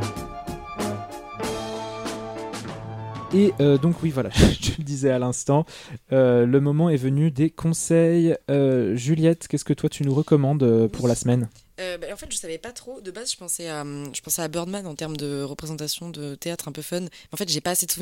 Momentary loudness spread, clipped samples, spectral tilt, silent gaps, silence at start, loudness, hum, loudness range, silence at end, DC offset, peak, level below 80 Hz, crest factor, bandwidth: 15 LU; under 0.1%; -5.5 dB/octave; none; 0 s; -23 LUFS; none; 9 LU; 0 s; under 0.1%; -2 dBFS; -42 dBFS; 20 dB; 16.5 kHz